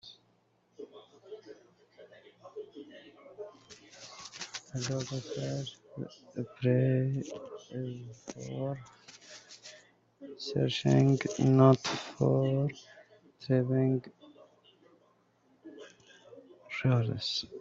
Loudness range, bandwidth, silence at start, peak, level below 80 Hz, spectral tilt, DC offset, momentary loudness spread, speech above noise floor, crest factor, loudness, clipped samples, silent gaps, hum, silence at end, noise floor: 21 LU; 7.8 kHz; 0.05 s; -8 dBFS; -68 dBFS; -6.5 dB/octave; under 0.1%; 24 LU; 41 dB; 24 dB; -31 LUFS; under 0.1%; none; none; 0 s; -71 dBFS